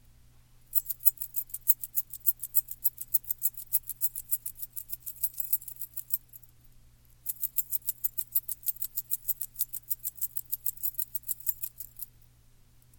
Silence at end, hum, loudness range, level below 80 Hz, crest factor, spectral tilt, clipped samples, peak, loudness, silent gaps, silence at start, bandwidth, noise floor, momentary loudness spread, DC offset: 0.95 s; none; 6 LU; -60 dBFS; 30 dB; 0 dB/octave; under 0.1%; -4 dBFS; -29 LUFS; none; 0.7 s; 17 kHz; -59 dBFS; 12 LU; under 0.1%